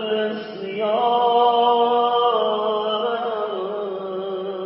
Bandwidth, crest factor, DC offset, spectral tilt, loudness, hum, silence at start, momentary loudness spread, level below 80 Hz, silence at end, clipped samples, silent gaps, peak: 5.8 kHz; 14 dB; under 0.1%; -9 dB/octave; -21 LUFS; none; 0 s; 11 LU; -74 dBFS; 0 s; under 0.1%; none; -6 dBFS